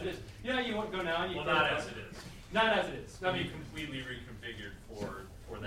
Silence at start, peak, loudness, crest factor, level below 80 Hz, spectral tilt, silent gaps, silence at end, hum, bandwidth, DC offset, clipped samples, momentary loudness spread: 0 s; -12 dBFS; -34 LUFS; 22 dB; -54 dBFS; -4.5 dB/octave; none; 0 s; none; 16 kHz; under 0.1%; under 0.1%; 17 LU